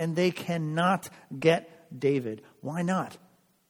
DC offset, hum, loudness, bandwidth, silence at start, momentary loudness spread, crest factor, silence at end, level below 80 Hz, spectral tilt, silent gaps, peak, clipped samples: under 0.1%; none; -28 LUFS; 19 kHz; 0 s; 14 LU; 20 dB; 0.55 s; -70 dBFS; -6 dB/octave; none; -8 dBFS; under 0.1%